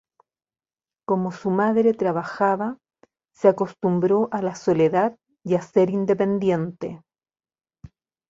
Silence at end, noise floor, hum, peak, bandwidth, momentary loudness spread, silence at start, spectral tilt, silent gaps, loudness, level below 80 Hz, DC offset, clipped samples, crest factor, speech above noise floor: 0.45 s; under -90 dBFS; none; -4 dBFS; 7.8 kHz; 11 LU; 1.1 s; -8 dB/octave; none; -22 LUFS; -64 dBFS; under 0.1%; under 0.1%; 20 dB; over 69 dB